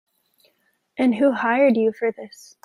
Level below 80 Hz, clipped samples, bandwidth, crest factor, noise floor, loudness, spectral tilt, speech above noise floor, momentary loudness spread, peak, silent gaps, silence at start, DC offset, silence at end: -70 dBFS; under 0.1%; 12 kHz; 16 dB; -67 dBFS; -20 LUFS; -6 dB/octave; 47 dB; 21 LU; -6 dBFS; none; 1 s; under 0.1%; 0.4 s